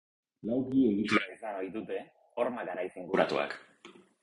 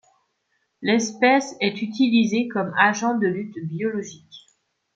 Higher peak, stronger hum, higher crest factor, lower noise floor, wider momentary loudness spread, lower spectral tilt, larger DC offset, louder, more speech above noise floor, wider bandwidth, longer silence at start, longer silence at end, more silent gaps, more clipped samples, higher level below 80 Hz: second, -12 dBFS vs -2 dBFS; neither; about the same, 22 dB vs 20 dB; second, -56 dBFS vs -72 dBFS; about the same, 13 LU vs 11 LU; first, -6 dB/octave vs -4.5 dB/octave; neither; second, -32 LUFS vs -22 LUFS; second, 25 dB vs 50 dB; first, 11 kHz vs 7.8 kHz; second, 0.45 s vs 0.8 s; second, 0.3 s vs 0.6 s; neither; neither; about the same, -70 dBFS vs -70 dBFS